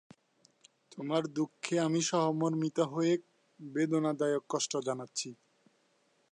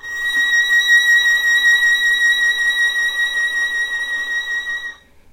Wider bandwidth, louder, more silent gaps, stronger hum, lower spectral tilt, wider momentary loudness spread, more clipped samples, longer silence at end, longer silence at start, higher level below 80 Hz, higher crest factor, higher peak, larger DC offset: second, 11 kHz vs 16 kHz; second, -33 LUFS vs -14 LUFS; neither; neither; first, -5 dB/octave vs 2.5 dB/octave; about the same, 10 LU vs 9 LU; neither; first, 1 s vs 0.4 s; first, 0.9 s vs 0.05 s; second, -84 dBFS vs -54 dBFS; first, 18 dB vs 12 dB; second, -16 dBFS vs -4 dBFS; neither